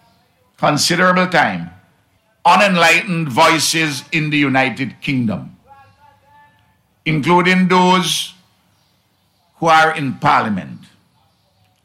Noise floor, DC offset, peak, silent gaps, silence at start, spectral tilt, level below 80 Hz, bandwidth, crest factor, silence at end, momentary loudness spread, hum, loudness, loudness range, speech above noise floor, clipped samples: -60 dBFS; under 0.1%; -2 dBFS; none; 0.6 s; -4 dB/octave; -58 dBFS; 16 kHz; 14 dB; 1.1 s; 11 LU; none; -14 LUFS; 5 LU; 46 dB; under 0.1%